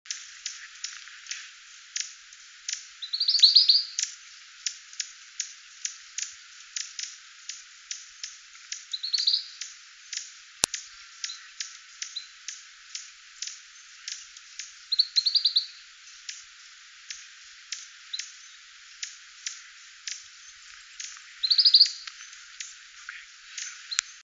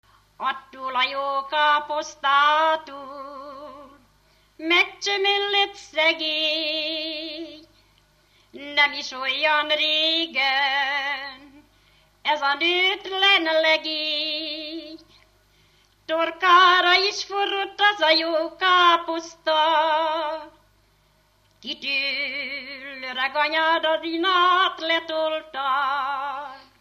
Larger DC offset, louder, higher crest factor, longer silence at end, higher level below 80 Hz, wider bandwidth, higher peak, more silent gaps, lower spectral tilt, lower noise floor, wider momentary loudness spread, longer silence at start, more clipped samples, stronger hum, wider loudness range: neither; second, -25 LUFS vs -21 LUFS; first, 30 dB vs 20 dB; second, 0.05 s vs 0.2 s; second, -72 dBFS vs -66 dBFS; second, 11 kHz vs 15 kHz; about the same, -2 dBFS vs -4 dBFS; neither; second, 3.5 dB/octave vs -1 dB/octave; second, -50 dBFS vs -62 dBFS; first, 24 LU vs 16 LU; second, 0.05 s vs 0.4 s; neither; second, none vs 50 Hz at -65 dBFS; first, 16 LU vs 5 LU